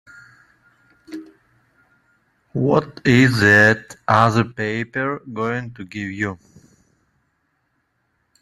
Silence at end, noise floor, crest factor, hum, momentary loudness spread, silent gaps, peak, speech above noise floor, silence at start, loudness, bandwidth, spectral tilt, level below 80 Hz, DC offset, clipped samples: 2.05 s; -69 dBFS; 20 dB; none; 22 LU; none; 0 dBFS; 51 dB; 1.1 s; -18 LUFS; 12.5 kHz; -6 dB/octave; -56 dBFS; under 0.1%; under 0.1%